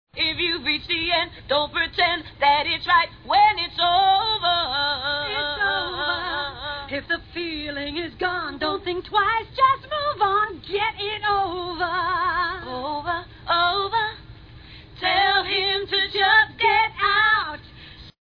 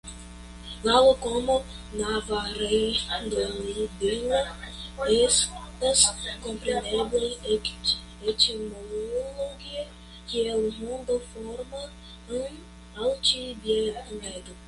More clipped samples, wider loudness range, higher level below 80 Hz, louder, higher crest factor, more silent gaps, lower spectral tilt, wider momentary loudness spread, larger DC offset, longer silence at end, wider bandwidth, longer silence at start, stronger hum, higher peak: neither; about the same, 6 LU vs 7 LU; about the same, -48 dBFS vs -46 dBFS; first, -22 LUFS vs -26 LUFS; second, 16 dB vs 22 dB; neither; first, -5.5 dB/octave vs -2 dB/octave; second, 11 LU vs 18 LU; neither; first, 0.15 s vs 0 s; second, 5.4 kHz vs 11.5 kHz; about the same, 0.15 s vs 0.05 s; neither; about the same, -6 dBFS vs -6 dBFS